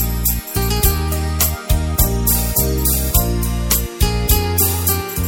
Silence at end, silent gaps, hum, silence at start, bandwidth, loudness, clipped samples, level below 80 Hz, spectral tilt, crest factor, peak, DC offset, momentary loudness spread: 0 s; none; none; 0 s; 17 kHz; -16 LUFS; under 0.1%; -20 dBFS; -4 dB/octave; 16 dB; 0 dBFS; under 0.1%; 5 LU